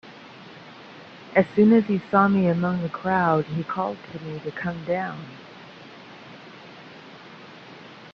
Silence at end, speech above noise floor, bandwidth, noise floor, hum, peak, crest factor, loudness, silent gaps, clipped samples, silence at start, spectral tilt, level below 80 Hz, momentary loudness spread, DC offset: 0.05 s; 22 dB; 6.4 kHz; -44 dBFS; none; -4 dBFS; 22 dB; -23 LUFS; none; under 0.1%; 0.05 s; -9 dB/octave; -64 dBFS; 25 LU; under 0.1%